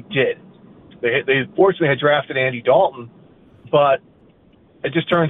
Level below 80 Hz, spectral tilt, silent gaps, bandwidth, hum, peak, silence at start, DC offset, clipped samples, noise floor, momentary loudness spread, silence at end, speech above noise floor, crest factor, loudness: -60 dBFS; -9 dB/octave; none; 4 kHz; none; -2 dBFS; 0.1 s; under 0.1%; under 0.1%; -52 dBFS; 8 LU; 0 s; 35 dB; 16 dB; -18 LUFS